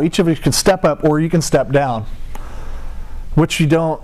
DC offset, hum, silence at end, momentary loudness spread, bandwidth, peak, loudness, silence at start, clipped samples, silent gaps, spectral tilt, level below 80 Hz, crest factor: 0.5%; none; 0 s; 20 LU; 15 kHz; -4 dBFS; -15 LUFS; 0 s; under 0.1%; none; -5.5 dB/octave; -28 dBFS; 12 dB